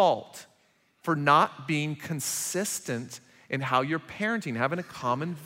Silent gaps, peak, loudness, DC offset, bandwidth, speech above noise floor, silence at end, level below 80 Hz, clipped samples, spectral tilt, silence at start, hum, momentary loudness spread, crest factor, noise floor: none; -6 dBFS; -28 LUFS; under 0.1%; 16 kHz; 39 dB; 0 s; -72 dBFS; under 0.1%; -4 dB/octave; 0 s; none; 14 LU; 22 dB; -67 dBFS